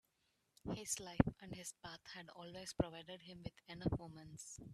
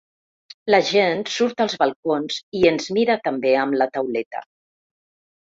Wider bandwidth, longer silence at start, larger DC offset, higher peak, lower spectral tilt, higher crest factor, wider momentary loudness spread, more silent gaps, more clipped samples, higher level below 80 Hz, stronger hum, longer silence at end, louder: first, 14 kHz vs 7.8 kHz; about the same, 0.65 s vs 0.65 s; neither; second, -16 dBFS vs -2 dBFS; about the same, -5 dB/octave vs -4 dB/octave; first, 28 dB vs 20 dB; first, 15 LU vs 9 LU; second, none vs 1.96-2.03 s, 2.43-2.52 s, 4.26-4.31 s; neither; about the same, -60 dBFS vs -62 dBFS; neither; second, 0 s vs 1.05 s; second, -45 LUFS vs -20 LUFS